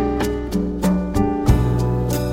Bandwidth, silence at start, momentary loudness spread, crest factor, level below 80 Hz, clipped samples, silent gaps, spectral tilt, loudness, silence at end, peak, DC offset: 16.5 kHz; 0 s; 5 LU; 16 dB; -26 dBFS; under 0.1%; none; -7.5 dB/octave; -20 LUFS; 0 s; -2 dBFS; under 0.1%